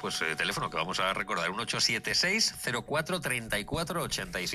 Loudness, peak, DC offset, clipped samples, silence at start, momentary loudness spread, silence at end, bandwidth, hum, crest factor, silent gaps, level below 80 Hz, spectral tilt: -29 LUFS; -14 dBFS; under 0.1%; under 0.1%; 0 s; 6 LU; 0 s; 15.5 kHz; none; 18 dB; none; -54 dBFS; -2.5 dB/octave